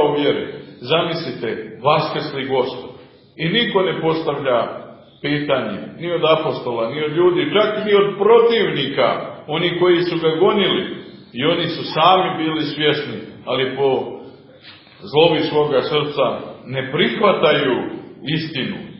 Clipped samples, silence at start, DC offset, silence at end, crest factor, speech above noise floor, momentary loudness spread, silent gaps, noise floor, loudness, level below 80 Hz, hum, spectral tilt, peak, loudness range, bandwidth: under 0.1%; 0 s; under 0.1%; 0 s; 18 dB; 25 dB; 13 LU; none; -43 dBFS; -18 LUFS; -58 dBFS; none; -9 dB/octave; 0 dBFS; 4 LU; 5.8 kHz